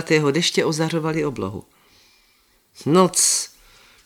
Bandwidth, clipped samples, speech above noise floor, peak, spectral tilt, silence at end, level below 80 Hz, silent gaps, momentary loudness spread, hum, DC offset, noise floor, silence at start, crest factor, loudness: 18 kHz; under 0.1%; 40 dB; -2 dBFS; -3.5 dB/octave; 0.6 s; -58 dBFS; none; 15 LU; none; under 0.1%; -60 dBFS; 0 s; 20 dB; -19 LUFS